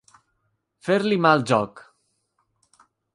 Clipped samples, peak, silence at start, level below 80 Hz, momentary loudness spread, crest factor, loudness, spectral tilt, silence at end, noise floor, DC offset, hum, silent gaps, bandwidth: under 0.1%; -4 dBFS; 0.85 s; -66 dBFS; 14 LU; 22 dB; -21 LUFS; -6 dB/octave; 1.35 s; -73 dBFS; under 0.1%; none; none; 11.5 kHz